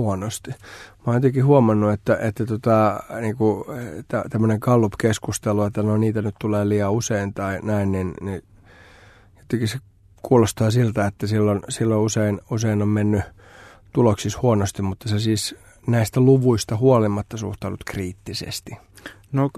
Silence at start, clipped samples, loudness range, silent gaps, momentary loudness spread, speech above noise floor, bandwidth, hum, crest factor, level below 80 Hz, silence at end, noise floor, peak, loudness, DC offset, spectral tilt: 0 s; under 0.1%; 4 LU; none; 14 LU; 29 dB; 13.5 kHz; none; 18 dB; -50 dBFS; 0 s; -50 dBFS; -2 dBFS; -21 LUFS; under 0.1%; -6.5 dB/octave